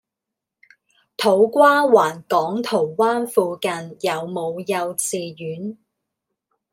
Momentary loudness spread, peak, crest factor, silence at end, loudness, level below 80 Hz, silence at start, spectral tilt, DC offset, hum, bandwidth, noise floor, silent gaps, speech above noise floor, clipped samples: 16 LU; -2 dBFS; 18 dB; 1 s; -19 LUFS; -74 dBFS; 1.2 s; -4 dB/octave; under 0.1%; none; 16.5 kHz; -84 dBFS; none; 65 dB; under 0.1%